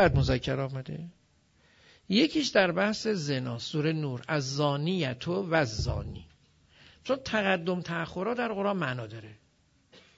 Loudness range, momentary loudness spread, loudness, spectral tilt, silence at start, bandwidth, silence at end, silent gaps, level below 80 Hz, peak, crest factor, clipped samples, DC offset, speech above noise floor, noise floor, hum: 4 LU; 14 LU; -29 LUFS; -5.5 dB/octave; 0 s; 8 kHz; 0.2 s; none; -48 dBFS; -8 dBFS; 22 dB; under 0.1%; under 0.1%; 38 dB; -67 dBFS; none